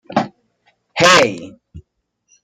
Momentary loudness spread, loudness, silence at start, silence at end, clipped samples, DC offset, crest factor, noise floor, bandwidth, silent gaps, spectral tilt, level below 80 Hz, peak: 19 LU; -13 LUFS; 0.1 s; 0.65 s; under 0.1%; under 0.1%; 18 dB; -68 dBFS; 16 kHz; none; -3 dB/octave; -54 dBFS; 0 dBFS